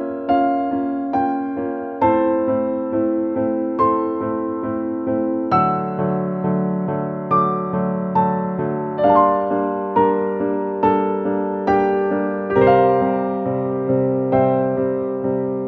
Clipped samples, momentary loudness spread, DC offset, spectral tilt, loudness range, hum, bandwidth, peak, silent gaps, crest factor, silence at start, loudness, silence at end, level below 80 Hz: under 0.1%; 6 LU; under 0.1%; -10.5 dB/octave; 3 LU; none; 5.8 kHz; -2 dBFS; none; 16 dB; 0 s; -19 LUFS; 0 s; -52 dBFS